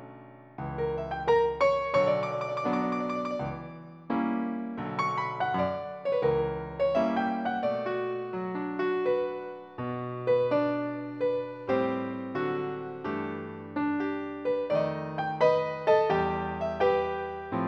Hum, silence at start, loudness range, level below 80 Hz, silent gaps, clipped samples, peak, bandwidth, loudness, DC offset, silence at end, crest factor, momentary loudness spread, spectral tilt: none; 0 s; 4 LU; -56 dBFS; none; under 0.1%; -10 dBFS; 7.8 kHz; -29 LUFS; under 0.1%; 0 s; 18 dB; 10 LU; -7.5 dB/octave